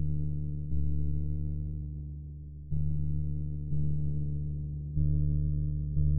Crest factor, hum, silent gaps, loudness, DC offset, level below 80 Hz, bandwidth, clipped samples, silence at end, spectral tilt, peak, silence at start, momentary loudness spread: 14 dB; none; none; -34 LUFS; under 0.1%; -36 dBFS; 0.8 kHz; under 0.1%; 0 s; -19.5 dB/octave; -16 dBFS; 0 s; 9 LU